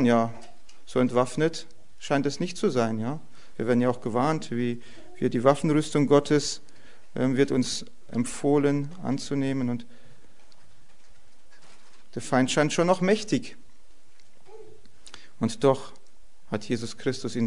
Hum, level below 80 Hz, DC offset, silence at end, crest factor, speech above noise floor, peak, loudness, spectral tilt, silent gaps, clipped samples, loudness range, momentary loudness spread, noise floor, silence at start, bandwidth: none; -60 dBFS; 2%; 0 s; 22 dB; 37 dB; -4 dBFS; -26 LUFS; -5.5 dB/octave; none; under 0.1%; 7 LU; 16 LU; -62 dBFS; 0 s; 11 kHz